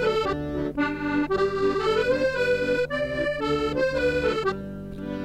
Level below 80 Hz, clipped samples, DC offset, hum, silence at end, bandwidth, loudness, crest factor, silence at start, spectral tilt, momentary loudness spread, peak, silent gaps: -44 dBFS; under 0.1%; under 0.1%; none; 0 s; 13 kHz; -25 LUFS; 14 dB; 0 s; -6 dB/octave; 6 LU; -12 dBFS; none